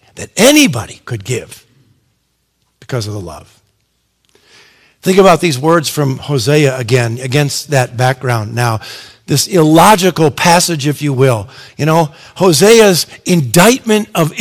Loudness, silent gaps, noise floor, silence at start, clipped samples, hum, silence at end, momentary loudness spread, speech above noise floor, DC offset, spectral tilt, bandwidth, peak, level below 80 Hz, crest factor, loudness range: -11 LUFS; none; -62 dBFS; 0.15 s; 1%; none; 0 s; 15 LU; 51 dB; under 0.1%; -4.5 dB/octave; over 20 kHz; 0 dBFS; -46 dBFS; 12 dB; 15 LU